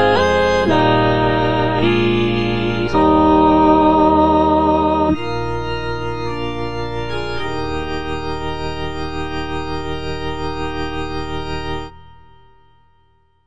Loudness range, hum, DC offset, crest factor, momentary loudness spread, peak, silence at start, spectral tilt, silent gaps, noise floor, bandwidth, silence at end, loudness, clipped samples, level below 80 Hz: 11 LU; none; 3%; 16 dB; 13 LU; -2 dBFS; 0 s; -7 dB/octave; none; -58 dBFS; 9.8 kHz; 0 s; -17 LUFS; under 0.1%; -34 dBFS